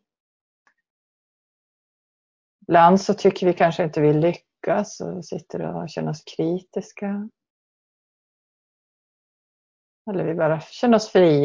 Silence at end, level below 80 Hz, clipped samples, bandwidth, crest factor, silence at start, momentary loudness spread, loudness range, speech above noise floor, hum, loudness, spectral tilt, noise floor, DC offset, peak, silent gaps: 0 s; -64 dBFS; under 0.1%; 7.6 kHz; 22 dB; 2.7 s; 16 LU; 15 LU; over 70 dB; none; -21 LUFS; -6.5 dB/octave; under -90 dBFS; under 0.1%; -2 dBFS; 7.50-10.05 s